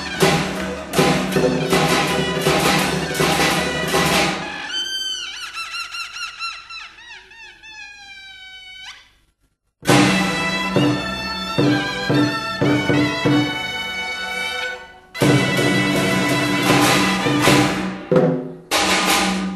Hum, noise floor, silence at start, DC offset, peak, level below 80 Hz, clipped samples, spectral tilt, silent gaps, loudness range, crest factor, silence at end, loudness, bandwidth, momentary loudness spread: none; -66 dBFS; 0 s; under 0.1%; 0 dBFS; -44 dBFS; under 0.1%; -4 dB/octave; none; 13 LU; 20 dB; 0 s; -18 LUFS; 13 kHz; 19 LU